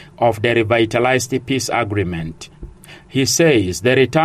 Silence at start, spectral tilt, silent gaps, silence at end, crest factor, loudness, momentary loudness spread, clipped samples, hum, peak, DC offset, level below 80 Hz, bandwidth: 0 s; -4.5 dB/octave; none; 0 s; 14 dB; -17 LUFS; 12 LU; under 0.1%; none; -2 dBFS; under 0.1%; -44 dBFS; 15.5 kHz